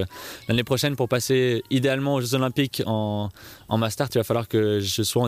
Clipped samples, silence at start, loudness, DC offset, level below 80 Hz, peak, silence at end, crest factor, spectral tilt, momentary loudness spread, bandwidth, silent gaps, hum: under 0.1%; 0 s; -24 LUFS; under 0.1%; -56 dBFS; -8 dBFS; 0 s; 16 dB; -5 dB/octave; 7 LU; 15.5 kHz; none; none